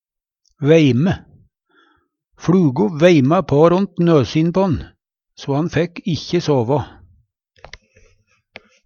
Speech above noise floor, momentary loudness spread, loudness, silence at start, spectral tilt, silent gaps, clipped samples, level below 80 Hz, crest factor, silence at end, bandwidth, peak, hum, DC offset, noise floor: 53 dB; 11 LU; -16 LUFS; 0.6 s; -7.5 dB/octave; none; under 0.1%; -46 dBFS; 18 dB; 2 s; 7 kHz; 0 dBFS; none; under 0.1%; -68 dBFS